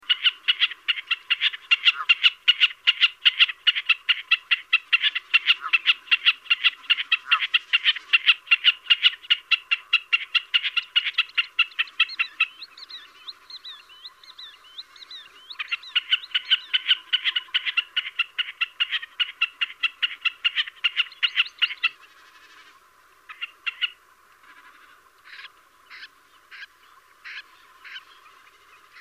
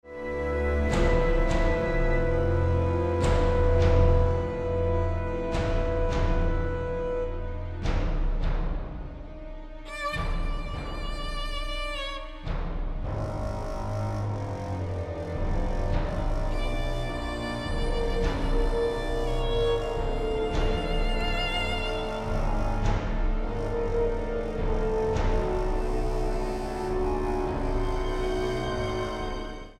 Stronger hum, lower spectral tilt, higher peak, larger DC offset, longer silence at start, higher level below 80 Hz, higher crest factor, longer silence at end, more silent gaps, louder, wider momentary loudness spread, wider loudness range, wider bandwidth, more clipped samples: neither; second, 3.5 dB/octave vs -6.5 dB/octave; first, -4 dBFS vs -10 dBFS; neither; about the same, 0.1 s vs 0.05 s; second, -78 dBFS vs -30 dBFS; about the same, 20 dB vs 18 dB; first, 1 s vs 0.05 s; neither; first, -21 LUFS vs -29 LUFS; first, 22 LU vs 9 LU; first, 16 LU vs 8 LU; first, 15 kHz vs 10 kHz; neither